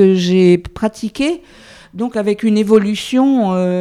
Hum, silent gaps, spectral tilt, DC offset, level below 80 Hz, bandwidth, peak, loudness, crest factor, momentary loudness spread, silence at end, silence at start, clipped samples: none; none; -6.5 dB/octave; under 0.1%; -46 dBFS; 13 kHz; 0 dBFS; -15 LUFS; 14 dB; 10 LU; 0 s; 0 s; under 0.1%